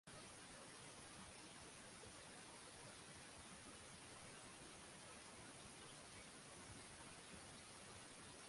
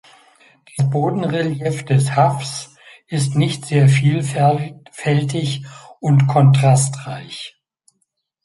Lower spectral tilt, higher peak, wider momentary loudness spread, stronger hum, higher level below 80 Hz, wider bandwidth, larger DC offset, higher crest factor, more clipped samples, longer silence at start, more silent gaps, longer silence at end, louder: second, -2.5 dB/octave vs -6 dB/octave; second, -44 dBFS vs -2 dBFS; second, 0 LU vs 17 LU; neither; second, -76 dBFS vs -56 dBFS; about the same, 11.5 kHz vs 11.5 kHz; neither; about the same, 16 dB vs 16 dB; neither; second, 0.05 s vs 0.75 s; neither; second, 0 s vs 0.95 s; second, -58 LUFS vs -17 LUFS